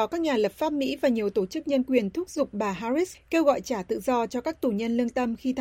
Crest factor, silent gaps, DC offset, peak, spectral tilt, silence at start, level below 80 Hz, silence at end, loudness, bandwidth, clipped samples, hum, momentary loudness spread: 18 dB; none; under 0.1%; -8 dBFS; -5.5 dB/octave; 0 s; -58 dBFS; 0 s; -27 LUFS; 16.5 kHz; under 0.1%; none; 5 LU